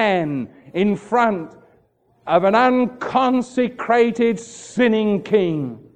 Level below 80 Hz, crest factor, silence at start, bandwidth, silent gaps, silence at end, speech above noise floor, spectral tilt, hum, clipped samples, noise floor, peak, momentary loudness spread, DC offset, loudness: -60 dBFS; 16 dB; 0 s; 9.4 kHz; none; 0.2 s; 41 dB; -6 dB/octave; none; under 0.1%; -59 dBFS; -2 dBFS; 13 LU; under 0.1%; -19 LUFS